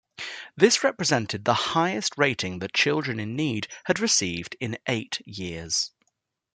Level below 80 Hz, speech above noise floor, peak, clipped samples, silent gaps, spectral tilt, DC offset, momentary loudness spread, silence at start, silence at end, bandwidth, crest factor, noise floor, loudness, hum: -64 dBFS; 51 dB; -4 dBFS; under 0.1%; none; -3 dB/octave; under 0.1%; 11 LU; 0.2 s; 0.65 s; 10.5 kHz; 22 dB; -77 dBFS; -25 LUFS; none